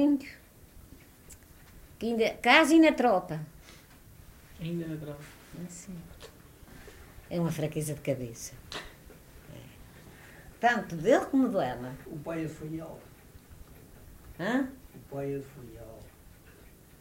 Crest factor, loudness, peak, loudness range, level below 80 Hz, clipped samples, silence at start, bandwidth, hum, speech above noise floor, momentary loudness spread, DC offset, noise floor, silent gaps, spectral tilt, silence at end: 26 dB; -29 LUFS; -6 dBFS; 12 LU; -56 dBFS; under 0.1%; 0 s; 16 kHz; none; 26 dB; 27 LU; under 0.1%; -54 dBFS; none; -5 dB/octave; 0.9 s